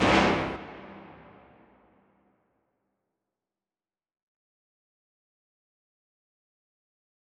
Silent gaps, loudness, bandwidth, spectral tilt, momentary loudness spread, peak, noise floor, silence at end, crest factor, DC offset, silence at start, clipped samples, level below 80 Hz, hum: none; -26 LUFS; 10.5 kHz; -5 dB/octave; 26 LU; -8 dBFS; under -90 dBFS; 6.35 s; 26 dB; under 0.1%; 0 s; under 0.1%; -52 dBFS; none